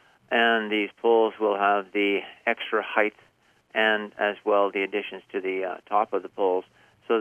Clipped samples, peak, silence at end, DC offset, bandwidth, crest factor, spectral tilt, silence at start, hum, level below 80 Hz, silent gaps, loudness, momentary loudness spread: under 0.1%; -6 dBFS; 0 s; under 0.1%; 4.1 kHz; 20 dB; -5.5 dB/octave; 0.3 s; none; -78 dBFS; none; -25 LUFS; 8 LU